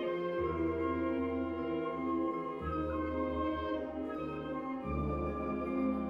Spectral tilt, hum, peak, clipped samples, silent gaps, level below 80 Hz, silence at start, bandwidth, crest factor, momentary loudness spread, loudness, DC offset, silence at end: -9 dB/octave; none; -24 dBFS; under 0.1%; none; -48 dBFS; 0 s; 5.6 kHz; 12 dB; 5 LU; -36 LUFS; under 0.1%; 0 s